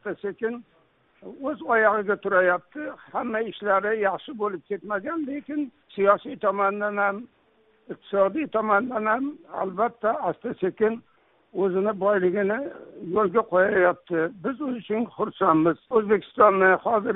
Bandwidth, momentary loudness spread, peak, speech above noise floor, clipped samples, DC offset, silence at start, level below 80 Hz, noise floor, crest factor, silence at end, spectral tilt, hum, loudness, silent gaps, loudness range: 4 kHz; 12 LU; -4 dBFS; 38 dB; under 0.1%; under 0.1%; 0.05 s; -66 dBFS; -62 dBFS; 20 dB; 0 s; -4.5 dB/octave; none; -24 LUFS; none; 3 LU